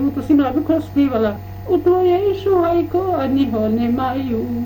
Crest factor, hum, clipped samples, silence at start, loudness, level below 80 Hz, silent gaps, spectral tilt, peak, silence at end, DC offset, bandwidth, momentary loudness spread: 12 dB; none; under 0.1%; 0 s; -17 LUFS; -42 dBFS; none; -8.5 dB/octave; -4 dBFS; 0 s; under 0.1%; 16.5 kHz; 6 LU